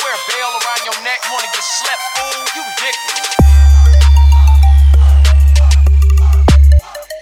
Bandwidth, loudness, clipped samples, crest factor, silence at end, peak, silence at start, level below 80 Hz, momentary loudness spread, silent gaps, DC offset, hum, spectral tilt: 15 kHz; -11 LUFS; under 0.1%; 8 dB; 0 s; 0 dBFS; 0 s; -10 dBFS; 9 LU; none; under 0.1%; none; -4.5 dB/octave